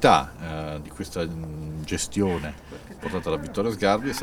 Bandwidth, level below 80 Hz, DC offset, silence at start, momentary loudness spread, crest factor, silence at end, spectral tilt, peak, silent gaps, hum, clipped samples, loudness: 18.5 kHz; -44 dBFS; under 0.1%; 0 s; 12 LU; 24 dB; 0 s; -5 dB/octave; -2 dBFS; none; none; under 0.1%; -27 LUFS